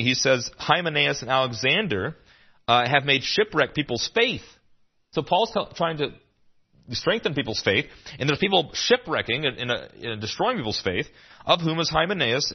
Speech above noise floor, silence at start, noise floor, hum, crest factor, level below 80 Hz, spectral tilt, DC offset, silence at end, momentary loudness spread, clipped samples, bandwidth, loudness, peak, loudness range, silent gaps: 37 dB; 0 s; -61 dBFS; none; 22 dB; -54 dBFS; -3.5 dB/octave; under 0.1%; 0 s; 11 LU; under 0.1%; 6.4 kHz; -23 LUFS; -2 dBFS; 4 LU; none